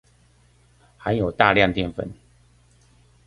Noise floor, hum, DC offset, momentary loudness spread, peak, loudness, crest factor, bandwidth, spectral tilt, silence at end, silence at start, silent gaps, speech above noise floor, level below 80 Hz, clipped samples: -57 dBFS; none; under 0.1%; 16 LU; 0 dBFS; -21 LUFS; 24 dB; 11.5 kHz; -7 dB/octave; 1.15 s; 1 s; none; 37 dB; -46 dBFS; under 0.1%